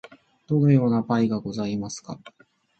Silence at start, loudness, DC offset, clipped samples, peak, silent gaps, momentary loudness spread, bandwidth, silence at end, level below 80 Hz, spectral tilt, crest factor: 0.5 s; -23 LUFS; under 0.1%; under 0.1%; -6 dBFS; none; 18 LU; 8.6 kHz; 0.5 s; -60 dBFS; -7.5 dB/octave; 18 dB